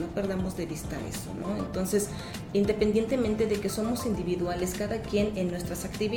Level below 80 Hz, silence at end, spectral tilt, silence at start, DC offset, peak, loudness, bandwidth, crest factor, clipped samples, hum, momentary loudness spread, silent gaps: -46 dBFS; 0 s; -5.5 dB/octave; 0 s; under 0.1%; -12 dBFS; -30 LUFS; 19 kHz; 16 dB; under 0.1%; none; 9 LU; none